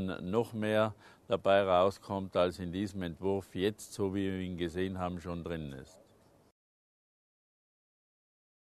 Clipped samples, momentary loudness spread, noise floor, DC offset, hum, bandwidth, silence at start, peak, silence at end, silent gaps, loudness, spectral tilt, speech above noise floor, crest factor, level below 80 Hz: under 0.1%; 11 LU; -64 dBFS; under 0.1%; none; 13 kHz; 0 s; -14 dBFS; 2.9 s; none; -33 LUFS; -6 dB/octave; 31 dB; 22 dB; -62 dBFS